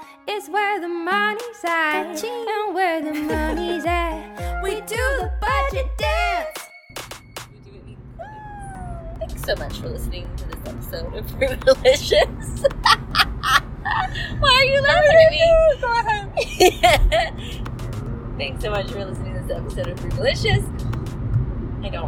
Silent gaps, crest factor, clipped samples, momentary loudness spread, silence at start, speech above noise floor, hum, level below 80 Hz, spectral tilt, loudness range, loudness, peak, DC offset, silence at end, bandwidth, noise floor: none; 20 dB; under 0.1%; 18 LU; 0 s; 22 dB; none; -32 dBFS; -4.5 dB/octave; 15 LU; -20 LUFS; 0 dBFS; under 0.1%; 0 s; 17 kHz; -41 dBFS